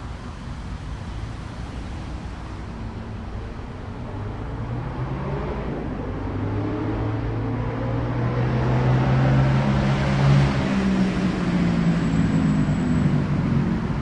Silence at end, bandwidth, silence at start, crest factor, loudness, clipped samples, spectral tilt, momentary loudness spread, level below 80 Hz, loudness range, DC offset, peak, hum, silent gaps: 0 s; 9.2 kHz; 0 s; 16 dB; -23 LUFS; under 0.1%; -8 dB/octave; 15 LU; -34 dBFS; 13 LU; under 0.1%; -8 dBFS; none; none